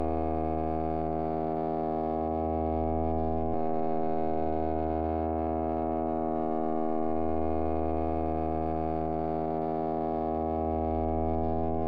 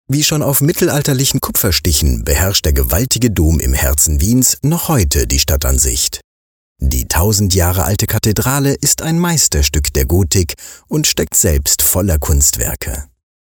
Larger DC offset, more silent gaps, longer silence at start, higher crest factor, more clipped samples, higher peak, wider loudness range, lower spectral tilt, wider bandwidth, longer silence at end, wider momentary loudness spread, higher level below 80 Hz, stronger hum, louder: neither; second, none vs 6.24-6.76 s; about the same, 0 s vs 0.1 s; about the same, 12 dB vs 14 dB; neither; second, -18 dBFS vs 0 dBFS; about the same, 0 LU vs 2 LU; first, -11.5 dB/octave vs -4 dB/octave; second, 4.9 kHz vs 20 kHz; second, 0 s vs 0.5 s; second, 1 LU vs 5 LU; second, -46 dBFS vs -20 dBFS; neither; second, -31 LUFS vs -13 LUFS